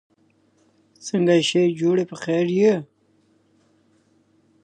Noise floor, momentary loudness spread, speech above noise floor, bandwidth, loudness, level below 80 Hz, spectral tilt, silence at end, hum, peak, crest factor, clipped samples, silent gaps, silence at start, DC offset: -62 dBFS; 10 LU; 42 dB; 9.6 kHz; -20 LUFS; -72 dBFS; -5.5 dB/octave; 1.8 s; none; -6 dBFS; 16 dB; under 0.1%; none; 1.05 s; under 0.1%